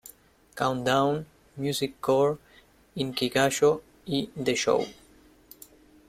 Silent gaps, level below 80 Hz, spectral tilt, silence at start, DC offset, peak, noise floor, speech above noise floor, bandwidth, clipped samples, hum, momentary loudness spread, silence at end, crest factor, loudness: none; -60 dBFS; -4.5 dB/octave; 0.05 s; under 0.1%; -8 dBFS; -58 dBFS; 32 dB; 16 kHz; under 0.1%; none; 13 LU; 1.15 s; 20 dB; -27 LUFS